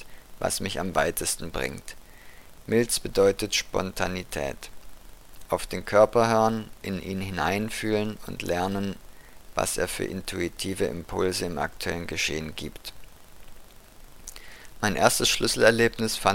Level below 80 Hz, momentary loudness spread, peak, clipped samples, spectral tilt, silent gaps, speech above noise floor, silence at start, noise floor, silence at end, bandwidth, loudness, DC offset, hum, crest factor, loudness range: -46 dBFS; 21 LU; -2 dBFS; under 0.1%; -3.5 dB/octave; none; 21 dB; 0 s; -47 dBFS; 0 s; 17 kHz; -26 LUFS; under 0.1%; none; 24 dB; 5 LU